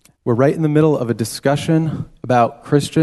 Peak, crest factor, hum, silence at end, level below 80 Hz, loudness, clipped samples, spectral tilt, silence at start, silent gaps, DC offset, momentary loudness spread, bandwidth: -2 dBFS; 14 dB; none; 0 s; -50 dBFS; -17 LUFS; under 0.1%; -6.5 dB/octave; 0.25 s; none; under 0.1%; 6 LU; 12.5 kHz